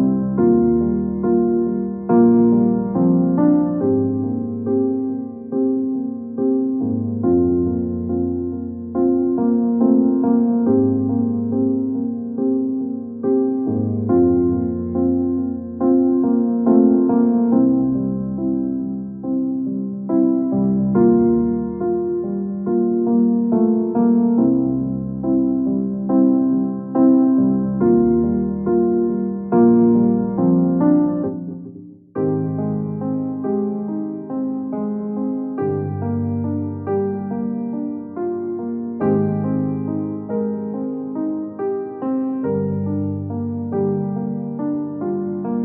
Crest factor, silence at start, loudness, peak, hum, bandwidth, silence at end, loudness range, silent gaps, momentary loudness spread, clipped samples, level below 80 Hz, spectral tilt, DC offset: 16 dB; 0 s; -19 LUFS; -2 dBFS; none; 2.1 kHz; 0 s; 7 LU; none; 9 LU; under 0.1%; -48 dBFS; -14 dB/octave; under 0.1%